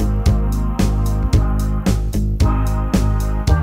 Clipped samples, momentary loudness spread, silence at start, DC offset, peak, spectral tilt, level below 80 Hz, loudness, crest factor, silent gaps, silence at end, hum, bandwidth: under 0.1%; 2 LU; 0 s; 0.2%; -2 dBFS; -7 dB/octave; -18 dBFS; -19 LUFS; 14 dB; none; 0 s; none; 15.5 kHz